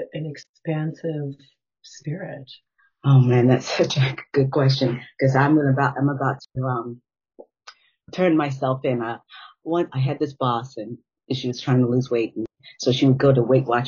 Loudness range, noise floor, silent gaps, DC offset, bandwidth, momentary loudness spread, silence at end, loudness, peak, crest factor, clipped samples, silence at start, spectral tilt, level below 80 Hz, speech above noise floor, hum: 6 LU; -50 dBFS; 0.49-0.54 s; under 0.1%; 7.2 kHz; 17 LU; 0 s; -21 LUFS; -4 dBFS; 18 dB; under 0.1%; 0 s; -6.5 dB/octave; -62 dBFS; 29 dB; none